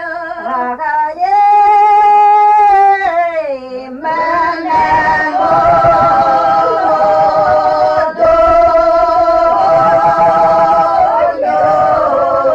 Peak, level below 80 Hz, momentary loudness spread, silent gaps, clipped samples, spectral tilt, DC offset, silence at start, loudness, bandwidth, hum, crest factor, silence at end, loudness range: -2 dBFS; -38 dBFS; 9 LU; none; under 0.1%; -6 dB/octave; under 0.1%; 0 s; -10 LUFS; 8 kHz; none; 8 dB; 0 s; 2 LU